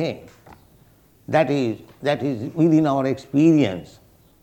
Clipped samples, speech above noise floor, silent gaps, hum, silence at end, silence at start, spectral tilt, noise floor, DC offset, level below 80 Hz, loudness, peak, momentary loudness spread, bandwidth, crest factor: under 0.1%; 34 dB; none; none; 0.55 s; 0 s; -7.5 dB/octave; -54 dBFS; under 0.1%; -58 dBFS; -20 LUFS; -4 dBFS; 10 LU; 8.8 kHz; 18 dB